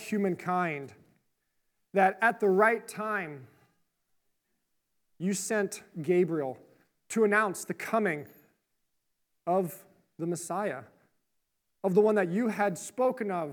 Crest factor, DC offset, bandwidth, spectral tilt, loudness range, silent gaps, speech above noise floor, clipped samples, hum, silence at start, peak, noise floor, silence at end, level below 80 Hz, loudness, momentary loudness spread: 22 dB; under 0.1%; 19.5 kHz; -5.5 dB/octave; 7 LU; none; 50 dB; under 0.1%; none; 0 s; -10 dBFS; -79 dBFS; 0 s; -86 dBFS; -29 LUFS; 14 LU